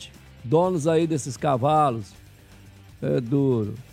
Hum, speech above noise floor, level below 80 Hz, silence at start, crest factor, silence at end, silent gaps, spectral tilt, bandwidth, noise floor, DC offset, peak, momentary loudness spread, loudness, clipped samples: none; 26 dB; -54 dBFS; 0 s; 18 dB; 0.1 s; none; -7 dB/octave; 14.5 kHz; -48 dBFS; under 0.1%; -6 dBFS; 14 LU; -23 LUFS; under 0.1%